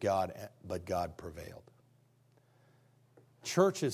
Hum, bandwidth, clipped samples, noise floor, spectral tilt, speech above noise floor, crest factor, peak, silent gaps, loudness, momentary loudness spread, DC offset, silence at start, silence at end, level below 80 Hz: none; 16 kHz; under 0.1%; -68 dBFS; -5 dB/octave; 34 dB; 24 dB; -12 dBFS; none; -35 LUFS; 19 LU; under 0.1%; 0 s; 0 s; -60 dBFS